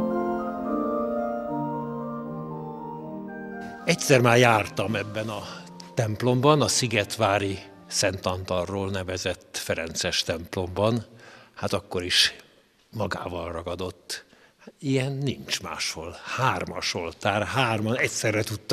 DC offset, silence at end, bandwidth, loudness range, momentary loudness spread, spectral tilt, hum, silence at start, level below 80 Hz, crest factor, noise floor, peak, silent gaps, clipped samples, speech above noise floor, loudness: under 0.1%; 0 s; 15.5 kHz; 7 LU; 16 LU; -4 dB/octave; none; 0 s; -60 dBFS; 24 dB; -51 dBFS; -2 dBFS; none; under 0.1%; 26 dB; -26 LUFS